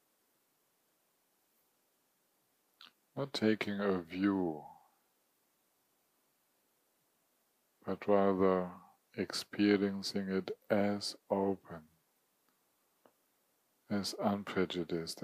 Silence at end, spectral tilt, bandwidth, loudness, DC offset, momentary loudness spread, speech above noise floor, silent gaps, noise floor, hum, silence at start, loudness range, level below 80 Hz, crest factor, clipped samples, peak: 0 s; -5.5 dB/octave; 15.5 kHz; -35 LUFS; under 0.1%; 13 LU; 43 dB; none; -77 dBFS; none; 2.8 s; 8 LU; -80 dBFS; 22 dB; under 0.1%; -16 dBFS